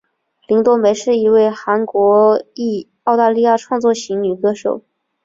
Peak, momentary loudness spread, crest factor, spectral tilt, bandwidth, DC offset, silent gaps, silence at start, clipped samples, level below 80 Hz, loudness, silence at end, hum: -2 dBFS; 9 LU; 12 dB; -5.5 dB/octave; 7.8 kHz; under 0.1%; none; 0.5 s; under 0.1%; -62 dBFS; -15 LUFS; 0.45 s; none